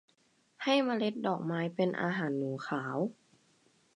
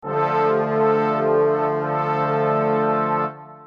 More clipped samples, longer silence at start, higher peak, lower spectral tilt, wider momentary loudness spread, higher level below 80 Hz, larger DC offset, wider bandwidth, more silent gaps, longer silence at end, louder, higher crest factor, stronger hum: neither; first, 0.6 s vs 0.05 s; second, -16 dBFS vs -8 dBFS; second, -6.5 dB/octave vs -9 dB/octave; first, 7 LU vs 4 LU; second, -82 dBFS vs -66 dBFS; neither; first, 10.5 kHz vs 6 kHz; neither; first, 0.85 s vs 0 s; second, -33 LUFS vs -20 LUFS; first, 18 dB vs 12 dB; neither